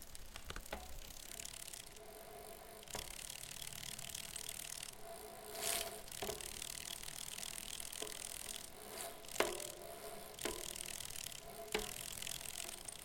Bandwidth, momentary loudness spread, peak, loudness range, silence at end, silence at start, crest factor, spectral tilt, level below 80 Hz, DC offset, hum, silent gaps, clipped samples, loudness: 17 kHz; 11 LU; -16 dBFS; 5 LU; 0 s; 0 s; 32 dB; -1 dB/octave; -62 dBFS; under 0.1%; none; none; under 0.1%; -45 LUFS